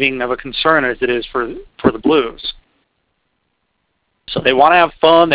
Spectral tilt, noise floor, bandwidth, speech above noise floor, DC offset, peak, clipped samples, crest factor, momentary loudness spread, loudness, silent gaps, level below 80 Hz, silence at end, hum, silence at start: -8.5 dB/octave; -68 dBFS; 4 kHz; 54 dB; under 0.1%; 0 dBFS; under 0.1%; 16 dB; 13 LU; -15 LUFS; none; -46 dBFS; 0 s; none; 0 s